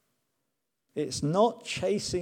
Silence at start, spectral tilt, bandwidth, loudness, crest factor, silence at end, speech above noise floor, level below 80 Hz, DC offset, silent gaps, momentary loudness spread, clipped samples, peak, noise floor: 0.95 s; -5 dB/octave; 16.5 kHz; -29 LUFS; 20 dB; 0 s; 54 dB; -58 dBFS; under 0.1%; none; 10 LU; under 0.1%; -12 dBFS; -83 dBFS